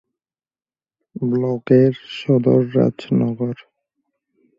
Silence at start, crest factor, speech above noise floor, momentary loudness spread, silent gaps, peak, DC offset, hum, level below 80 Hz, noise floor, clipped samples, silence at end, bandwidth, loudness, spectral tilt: 1.15 s; 18 dB; over 73 dB; 12 LU; none; -2 dBFS; under 0.1%; none; -58 dBFS; under -90 dBFS; under 0.1%; 1.05 s; 7.4 kHz; -18 LUFS; -9.5 dB/octave